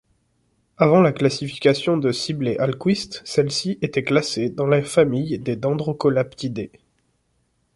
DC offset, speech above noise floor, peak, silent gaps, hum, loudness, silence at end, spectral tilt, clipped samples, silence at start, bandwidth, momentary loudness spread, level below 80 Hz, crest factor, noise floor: under 0.1%; 47 dB; -2 dBFS; none; none; -21 LUFS; 1.1 s; -6 dB/octave; under 0.1%; 0.8 s; 11.5 kHz; 8 LU; -58 dBFS; 18 dB; -67 dBFS